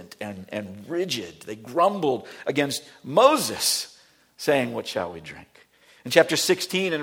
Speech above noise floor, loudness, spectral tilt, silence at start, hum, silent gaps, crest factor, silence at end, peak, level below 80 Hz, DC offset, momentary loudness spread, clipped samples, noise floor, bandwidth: 31 dB; -24 LUFS; -3 dB/octave; 0 s; none; none; 24 dB; 0 s; 0 dBFS; -66 dBFS; under 0.1%; 17 LU; under 0.1%; -55 dBFS; 18.5 kHz